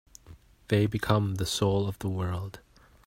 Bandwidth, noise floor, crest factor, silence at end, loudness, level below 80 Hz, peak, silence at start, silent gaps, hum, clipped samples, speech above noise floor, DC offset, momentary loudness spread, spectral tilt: 16 kHz; -53 dBFS; 20 dB; 0.45 s; -28 LUFS; -52 dBFS; -10 dBFS; 0.3 s; none; none; under 0.1%; 26 dB; under 0.1%; 7 LU; -5.5 dB/octave